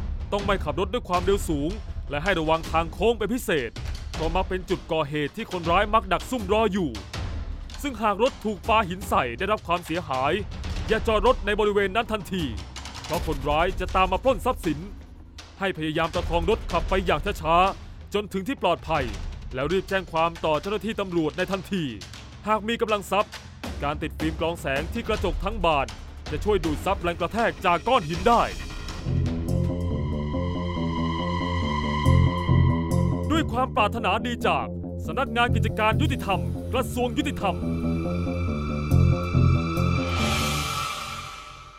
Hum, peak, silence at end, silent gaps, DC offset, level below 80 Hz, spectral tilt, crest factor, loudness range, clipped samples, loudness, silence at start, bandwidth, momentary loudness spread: none; -6 dBFS; 0 s; none; under 0.1%; -36 dBFS; -6 dB/octave; 18 dB; 3 LU; under 0.1%; -25 LUFS; 0 s; 16 kHz; 11 LU